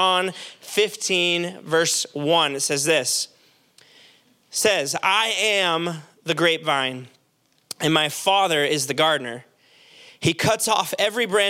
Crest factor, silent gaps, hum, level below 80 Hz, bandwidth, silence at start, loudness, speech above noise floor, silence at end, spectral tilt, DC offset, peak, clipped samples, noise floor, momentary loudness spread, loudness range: 20 dB; none; none; -68 dBFS; 17 kHz; 0 s; -21 LUFS; 43 dB; 0 s; -2.5 dB/octave; under 0.1%; -4 dBFS; under 0.1%; -65 dBFS; 10 LU; 1 LU